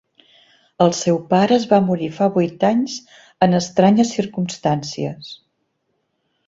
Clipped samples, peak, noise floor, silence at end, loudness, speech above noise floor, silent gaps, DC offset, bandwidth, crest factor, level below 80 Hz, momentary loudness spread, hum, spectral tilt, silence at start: under 0.1%; -2 dBFS; -70 dBFS; 1.15 s; -18 LUFS; 53 dB; none; under 0.1%; 7.8 kHz; 18 dB; -58 dBFS; 12 LU; none; -6 dB/octave; 0.8 s